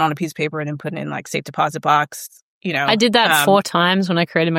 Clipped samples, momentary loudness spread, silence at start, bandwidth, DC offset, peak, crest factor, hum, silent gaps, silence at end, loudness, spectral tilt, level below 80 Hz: under 0.1%; 13 LU; 0 s; 16.5 kHz; under 0.1%; 0 dBFS; 18 dB; none; 2.42-2.61 s; 0 s; -18 LUFS; -4 dB/octave; -64 dBFS